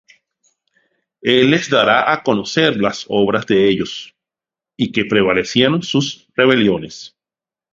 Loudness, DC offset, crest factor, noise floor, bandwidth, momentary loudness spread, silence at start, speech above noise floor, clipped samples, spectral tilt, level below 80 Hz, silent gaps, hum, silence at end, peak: -15 LUFS; under 0.1%; 16 dB; -90 dBFS; 7.6 kHz; 10 LU; 1.25 s; 75 dB; under 0.1%; -5 dB/octave; -52 dBFS; none; none; 0.65 s; 0 dBFS